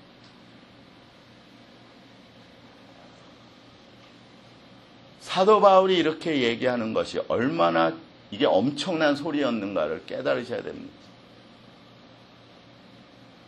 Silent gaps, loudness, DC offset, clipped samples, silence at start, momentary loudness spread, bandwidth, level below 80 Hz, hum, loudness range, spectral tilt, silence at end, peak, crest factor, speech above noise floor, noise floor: none; -23 LUFS; under 0.1%; under 0.1%; 5.2 s; 17 LU; 11 kHz; -66 dBFS; none; 11 LU; -5.5 dB/octave; 2.6 s; -4 dBFS; 24 dB; 28 dB; -52 dBFS